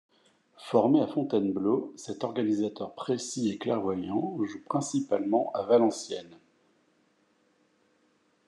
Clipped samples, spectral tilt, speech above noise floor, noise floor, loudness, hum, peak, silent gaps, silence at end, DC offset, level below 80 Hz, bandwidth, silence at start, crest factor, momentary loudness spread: under 0.1%; -6 dB/octave; 41 dB; -69 dBFS; -29 LUFS; none; -8 dBFS; none; 2.15 s; under 0.1%; -80 dBFS; 11 kHz; 0.6 s; 20 dB; 12 LU